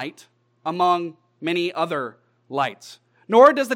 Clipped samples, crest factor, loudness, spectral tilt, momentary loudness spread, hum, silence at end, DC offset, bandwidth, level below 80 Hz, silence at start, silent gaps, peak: under 0.1%; 20 dB; -21 LUFS; -5 dB/octave; 20 LU; none; 0 s; under 0.1%; 16 kHz; -86 dBFS; 0 s; none; -2 dBFS